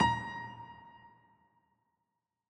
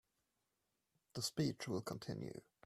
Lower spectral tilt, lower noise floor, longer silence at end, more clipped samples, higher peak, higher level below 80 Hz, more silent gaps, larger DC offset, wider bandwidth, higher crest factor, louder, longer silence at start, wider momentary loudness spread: about the same, -4.5 dB/octave vs -5 dB/octave; about the same, -86 dBFS vs -87 dBFS; first, 1.4 s vs 0.25 s; neither; first, -16 dBFS vs -26 dBFS; first, -60 dBFS vs -76 dBFS; neither; neither; second, 9.6 kHz vs 15.5 kHz; about the same, 24 dB vs 22 dB; first, -37 LUFS vs -44 LUFS; second, 0 s vs 1.15 s; first, 23 LU vs 11 LU